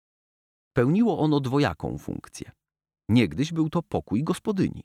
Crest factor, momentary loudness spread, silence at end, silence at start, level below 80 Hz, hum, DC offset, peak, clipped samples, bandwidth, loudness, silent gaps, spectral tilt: 18 dB; 16 LU; 0.05 s; 0.75 s; -52 dBFS; none; under 0.1%; -8 dBFS; under 0.1%; 14.5 kHz; -25 LUFS; none; -7 dB/octave